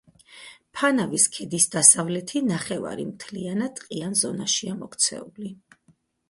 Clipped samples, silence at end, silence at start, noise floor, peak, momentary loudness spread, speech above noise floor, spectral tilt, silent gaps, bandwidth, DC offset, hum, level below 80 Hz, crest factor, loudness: under 0.1%; 0.75 s; 0.3 s; -63 dBFS; 0 dBFS; 19 LU; 39 dB; -2.5 dB/octave; none; 12 kHz; under 0.1%; none; -66 dBFS; 24 dB; -22 LUFS